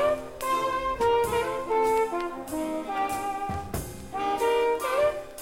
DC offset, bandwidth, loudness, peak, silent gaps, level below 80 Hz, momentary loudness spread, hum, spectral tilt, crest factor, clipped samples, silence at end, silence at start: under 0.1%; 16.5 kHz; -27 LUFS; -14 dBFS; none; -48 dBFS; 8 LU; none; -4.5 dB/octave; 12 dB; under 0.1%; 0 s; 0 s